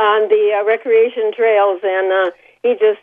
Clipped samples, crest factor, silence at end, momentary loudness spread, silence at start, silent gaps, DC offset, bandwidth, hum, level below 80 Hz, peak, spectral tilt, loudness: under 0.1%; 12 dB; 0.05 s; 5 LU; 0 s; none; under 0.1%; 3.7 kHz; none; -72 dBFS; -2 dBFS; -5 dB/octave; -15 LUFS